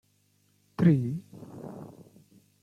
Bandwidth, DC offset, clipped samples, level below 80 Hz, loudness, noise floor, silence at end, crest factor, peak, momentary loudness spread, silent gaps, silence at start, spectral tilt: 6.8 kHz; under 0.1%; under 0.1%; -66 dBFS; -26 LUFS; -68 dBFS; 0.75 s; 22 dB; -10 dBFS; 23 LU; none; 0.8 s; -9.5 dB/octave